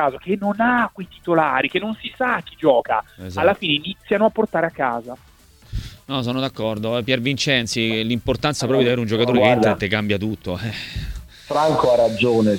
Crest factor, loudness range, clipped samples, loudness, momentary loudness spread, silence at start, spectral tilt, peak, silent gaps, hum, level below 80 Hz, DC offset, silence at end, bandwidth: 20 dB; 4 LU; under 0.1%; -20 LUFS; 13 LU; 0 s; -5 dB/octave; 0 dBFS; none; none; -42 dBFS; under 0.1%; 0 s; 18 kHz